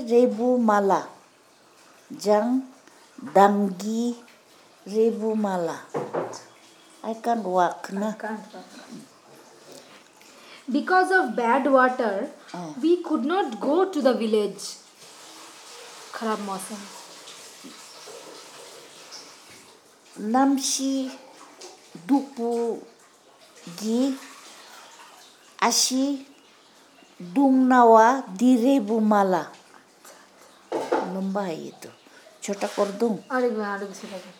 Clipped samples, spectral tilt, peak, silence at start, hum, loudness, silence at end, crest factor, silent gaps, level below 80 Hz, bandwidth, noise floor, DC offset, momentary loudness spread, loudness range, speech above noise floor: under 0.1%; -4 dB/octave; -4 dBFS; 0 s; none; -23 LUFS; 0.1 s; 22 dB; none; under -90 dBFS; 18.5 kHz; -56 dBFS; under 0.1%; 23 LU; 14 LU; 33 dB